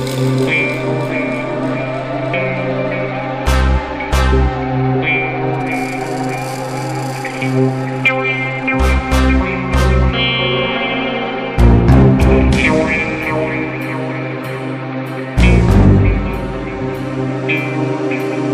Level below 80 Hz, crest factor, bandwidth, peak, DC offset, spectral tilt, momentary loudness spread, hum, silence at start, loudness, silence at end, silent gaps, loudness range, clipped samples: -20 dBFS; 14 dB; 14.5 kHz; 0 dBFS; under 0.1%; -6.5 dB/octave; 10 LU; none; 0 s; -15 LUFS; 0 s; none; 5 LU; under 0.1%